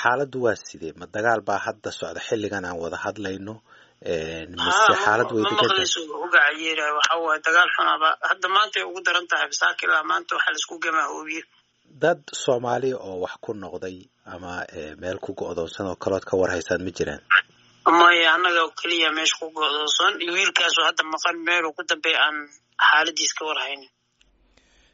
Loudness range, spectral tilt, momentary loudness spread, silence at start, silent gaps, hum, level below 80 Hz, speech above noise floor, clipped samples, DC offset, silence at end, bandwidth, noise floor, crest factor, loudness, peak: 9 LU; 0 dB/octave; 15 LU; 0 s; none; none; -60 dBFS; 40 dB; under 0.1%; under 0.1%; 1.1 s; 8 kHz; -62 dBFS; 20 dB; -21 LUFS; -2 dBFS